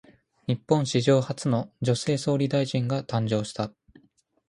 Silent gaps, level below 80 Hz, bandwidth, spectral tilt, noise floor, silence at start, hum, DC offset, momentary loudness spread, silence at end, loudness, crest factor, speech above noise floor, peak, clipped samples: none; -62 dBFS; 11 kHz; -6 dB/octave; -63 dBFS; 0.5 s; none; under 0.1%; 9 LU; 0.8 s; -26 LUFS; 20 dB; 38 dB; -6 dBFS; under 0.1%